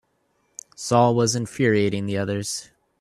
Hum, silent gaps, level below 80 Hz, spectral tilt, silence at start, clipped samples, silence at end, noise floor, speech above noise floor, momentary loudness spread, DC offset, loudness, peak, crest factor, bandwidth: none; none; -60 dBFS; -5 dB/octave; 0.8 s; under 0.1%; 0.4 s; -68 dBFS; 47 dB; 20 LU; under 0.1%; -22 LUFS; -4 dBFS; 20 dB; 13.5 kHz